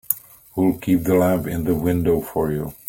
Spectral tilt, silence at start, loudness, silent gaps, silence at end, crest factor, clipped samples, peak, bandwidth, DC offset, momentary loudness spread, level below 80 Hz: -7 dB/octave; 0.1 s; -21 LUFS; none; 0.15 s; 20 dB; under 0.1%; -2 dBFS; 17 kHz; under 0.1%; 7 LU; -44 dBFS